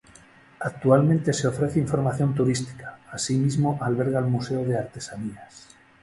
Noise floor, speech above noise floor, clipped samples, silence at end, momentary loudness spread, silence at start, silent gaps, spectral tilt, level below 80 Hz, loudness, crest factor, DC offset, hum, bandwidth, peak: -52 dBFS; 28 dB; under 0.1%; 0.45 s; 15 LU; 0.6 s; none; -6.5 dB/octave; -56 dBFS; -24 LUFS; 20 dB; under 0.1%; none; 11.5 kHz; -4 dBFS